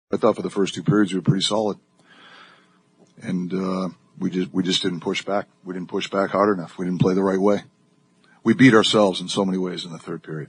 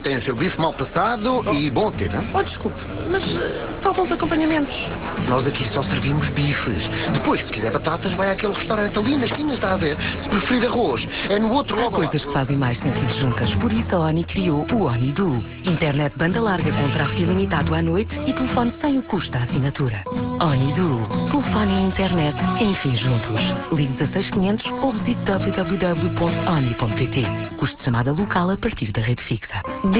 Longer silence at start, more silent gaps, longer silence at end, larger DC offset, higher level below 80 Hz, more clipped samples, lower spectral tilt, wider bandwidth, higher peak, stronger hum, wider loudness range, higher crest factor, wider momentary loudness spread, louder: about the same, 0.1 s vs 0 s; neither; about the same, 0.05 s vs 0 s; neither; second, -64 dBFS vs -38 dBFS; neither; second, -5.5 dB/octave vs -11 dB/octave; first, 10 kHz vs 4 kHz; first, -2 dBFS vs -6 dBFS; neither; first, 7 LU vs 1 LU; first, 20 dB vs 14 dB; first, 15 LU vs 4 LU; about the same, -21 LUFS vs -21 LUFS